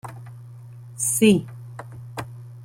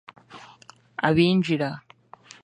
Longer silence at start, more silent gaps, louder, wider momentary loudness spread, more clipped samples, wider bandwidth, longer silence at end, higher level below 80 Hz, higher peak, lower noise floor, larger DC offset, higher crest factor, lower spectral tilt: second, 0.05 s vs 0.3 s; neither; first, -20 LUFS vs -23 LUFS; first, 24 LU vs 21 LU; neither; first, 16.5 kHz vs 10.5 kHz; second, 0 s vs 0.65 s; about the same, -60 dBFS vs -58 dBFS; about the same, -4 dBFS vs -4 dBFS; second, -41 dBFS vs -52 dBFS; neither; about the same, 20 dB vs 22 dB; second, -4.5 dB/octave vs -7 dB/octave